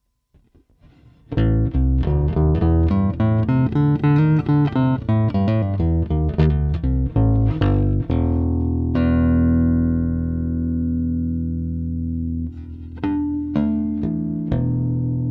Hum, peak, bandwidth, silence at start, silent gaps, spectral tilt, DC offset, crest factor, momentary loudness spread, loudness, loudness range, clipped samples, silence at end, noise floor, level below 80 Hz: none; -6 dBFS; 5 kHz; 1.3 s; none; -11.5 dB/octave; under 0.1%; 14 dB; 8 LU; -20 LUFS; 6 LU; under 0.1%; 0 s; -59 dBFS; -26 dBFS